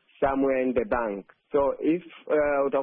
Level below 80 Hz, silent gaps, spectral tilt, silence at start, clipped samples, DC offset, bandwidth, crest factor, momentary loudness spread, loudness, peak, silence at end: -50 dBFS; none; -10.5 dB/octave; 0.2 s; under 0.1%; under 0.1%; 3.7 kHz; 12 dB; 6 LU; -26 LUFS; -14 dBFS; 0 s